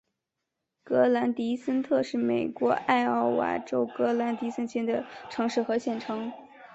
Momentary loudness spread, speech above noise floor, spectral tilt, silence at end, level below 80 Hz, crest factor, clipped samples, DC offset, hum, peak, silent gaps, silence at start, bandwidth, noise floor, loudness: 8 LU; 57 dB; -5.5 dB/octave; 0.05 s; -70 dBFS; 20 dB; under 0.1%; under 0.1%; none; -8 dBFS; none; 0.85 s; 8 kHz; -84 dBFS; -28 LUFS